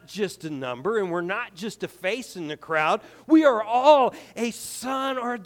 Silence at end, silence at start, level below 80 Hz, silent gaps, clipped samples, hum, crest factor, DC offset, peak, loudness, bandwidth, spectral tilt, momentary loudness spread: 0 s; 0.1 s; -70 dBFS; none; under 0.1%; none; 18 dB; under 0.1%; -6 dBFS; -24 LUFS; 18 kHz; -4.5 dB/octave; 15 LU